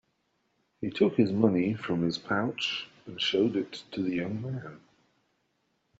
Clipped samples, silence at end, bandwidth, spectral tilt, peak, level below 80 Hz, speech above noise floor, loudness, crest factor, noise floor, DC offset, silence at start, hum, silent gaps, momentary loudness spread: under 0.1%; 1.2 s; 8 kHz; -4.5 dB/octave; -10 dBFS; -68 dBFS; 46 dB; -29 LUFS; 22 dB; -75 dBFS; under 0.1%; 0.8 s; none; none; 13 LU